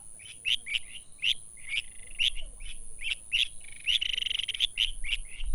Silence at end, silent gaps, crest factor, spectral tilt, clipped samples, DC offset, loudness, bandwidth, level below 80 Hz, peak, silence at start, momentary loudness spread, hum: 0 s; none; 20 dB; 1.5 dB/octave; under 0.1%; under 0.1%; -29 LUFS; over 20 kHz; -42 dBFS; -10 dBFS; 0 s; 17 LU; none